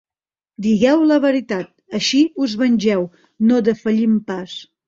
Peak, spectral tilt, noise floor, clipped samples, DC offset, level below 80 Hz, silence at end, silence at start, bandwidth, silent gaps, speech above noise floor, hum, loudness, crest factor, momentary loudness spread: -4 dBFS; -5.5 dB/octave; under -90 dBFS; under 0.1%; under 0.1%; -58 dBFS; 0.25 s; 0.6 s; 7.6 kHz; none; over 73 dB; none; -17 LUFS; 14 dB; 13 LU